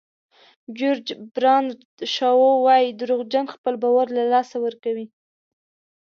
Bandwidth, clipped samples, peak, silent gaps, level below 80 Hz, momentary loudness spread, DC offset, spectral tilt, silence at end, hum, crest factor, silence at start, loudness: 6.8 kHz; under 0.1%; -6 dBFS; 1.85-1.98 s, 3.58-3.64 s; -78 dBFS; 14 LU; under 0.1%; -4 dB/octave; 0.95 s; none; 16 dB; 0.7 s; -21 LUFS